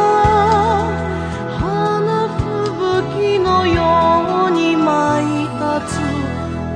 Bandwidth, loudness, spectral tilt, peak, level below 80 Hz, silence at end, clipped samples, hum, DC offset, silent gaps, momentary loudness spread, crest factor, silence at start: 10.5 kHz; -16 LUFS; -6.5 dB/octave; -2 dBFS; -34 dBFS; 0 s; under 0.1%; none; under 0.1%; none; 8 LU; 14 dB; 0 s